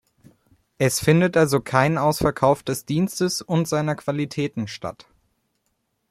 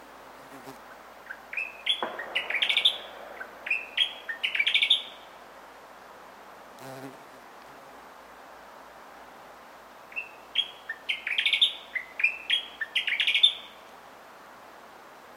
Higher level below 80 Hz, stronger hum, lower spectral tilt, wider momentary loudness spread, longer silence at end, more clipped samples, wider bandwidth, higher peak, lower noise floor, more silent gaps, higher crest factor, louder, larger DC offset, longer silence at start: first, -52 dBFS vs -72 dBFS; neither; first, -5.5 dB/octave vs 0 dB/octave; second, 9 LU vs 26 LU; first, 1.2 s vs 0 s; neither; about the same, 15.5 kHz vs 16 kHz; first, -2 dBFS vs -8 dBFS; first, -73 dBFS vs -49 dBFS; neither; about the same, 20 dB vs 24 dB; first, -21 LUFS vs -26 LUFS; neither; first, 0.8 s vs 0 s